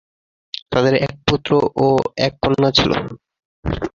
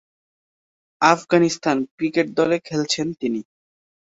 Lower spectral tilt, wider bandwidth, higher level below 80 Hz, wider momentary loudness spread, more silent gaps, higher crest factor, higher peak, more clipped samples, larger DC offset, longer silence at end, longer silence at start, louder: first, -6 dB/octave vs -4.5 dB/octave; about the same, 7.4 kHz vs 8 kHz; first, -38 dBFS vs -64 dBFS; first, 15 LU vs 8 LU; first, 3.45-3.63 s vs 1.91-1.98 s; about the same, 18 dB vs 20 dB; about the same, -2 dBFS vs -2 dBFS; neither; neither; second, 0.05 s vs 0.7 s; second, 0.7 s vs 1 s; first, -17 LUFS vs -21 LUFS